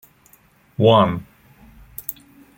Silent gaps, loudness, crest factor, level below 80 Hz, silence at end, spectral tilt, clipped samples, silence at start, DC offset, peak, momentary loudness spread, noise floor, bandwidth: none; -18 LUFS; 20 dB; -52 dBFS; 0.45 s; -7 dB/octave; under 0.1%; 0.8 s; under 0.1%; -2 dBFS; 23 LU; -55 dBFS; 17 kHz